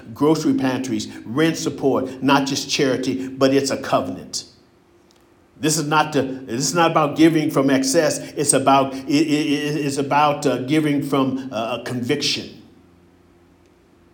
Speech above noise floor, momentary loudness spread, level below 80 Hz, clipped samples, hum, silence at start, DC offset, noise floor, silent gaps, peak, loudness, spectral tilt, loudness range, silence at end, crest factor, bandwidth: 35 dB; 9 LU; -62 dBFS; under 0.1%; none; 0 s; under 0.1%; -54 dBFS; none; -2 dBFS; -19 LUFS; -4 dB/octave; 5 LU; 1.55 s; 18 dB; 18 kHz